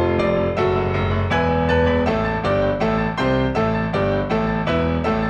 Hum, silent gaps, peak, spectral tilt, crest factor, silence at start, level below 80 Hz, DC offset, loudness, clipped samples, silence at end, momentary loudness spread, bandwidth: none; none; -6 dBFS; -8 dB/octave; 14 dB; 0 s; -32 dBFS; under 0.1%; -20 LUFS; under 0.1%; 0 s; 3 LU; 8.8 kHz